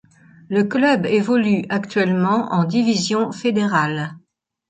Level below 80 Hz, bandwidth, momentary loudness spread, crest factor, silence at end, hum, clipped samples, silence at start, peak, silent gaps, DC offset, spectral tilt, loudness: -62 dBFS; 9.2 kHz; 5 LU; 16 dB; 0.5 s; none; under 0.1%; 0.5 s; -4 dBFS; none; under 0.1%; -6 dB/octave; -19 LUFS